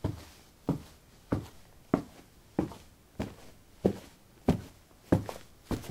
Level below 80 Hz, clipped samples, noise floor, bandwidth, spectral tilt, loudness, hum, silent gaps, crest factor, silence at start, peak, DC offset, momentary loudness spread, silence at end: -52 dBFS; under 0.1%; -56 dBFS; 16 kHz; -7.5 dB/octave; -35 LUFS; none; none; 28 dB; 0.05 s; -8 dBFS; under 0.1%; 22 LU; 0 s